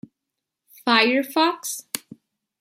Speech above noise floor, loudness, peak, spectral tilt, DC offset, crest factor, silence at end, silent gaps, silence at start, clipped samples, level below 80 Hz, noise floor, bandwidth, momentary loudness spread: 63 dB; -21 LUFS; -2 dBFS; -1.5 dB/octave; under 0.1%; 22 dB; 0.6 s; none; 0.85 s; under 0.1%; -76 dBFS; -83 dBFS; 16.5 kHz; 14 LU